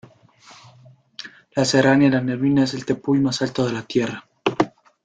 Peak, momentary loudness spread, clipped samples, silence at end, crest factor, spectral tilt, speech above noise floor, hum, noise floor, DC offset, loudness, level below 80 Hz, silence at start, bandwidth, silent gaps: -2 dBFS; 14 LU; under 0.1%; 0.35 s; 20 dB; -5.5 dB/octave; 32 dB; none; -50 dBFS; under 0.1%; -20 LUFS; -58 dBFS; 1.2 s; 9.4 kHz; none